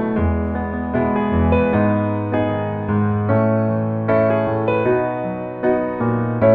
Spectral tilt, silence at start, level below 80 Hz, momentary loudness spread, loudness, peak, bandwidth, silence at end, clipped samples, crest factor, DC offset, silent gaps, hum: -11.5 dB/octave; 0 s; -34 dBFS; 6 LU; -19 LUFS; -2 dBFS; 4.4 kHz; 0 s; under 0.1%; 16 dB; under 0.1%; none; none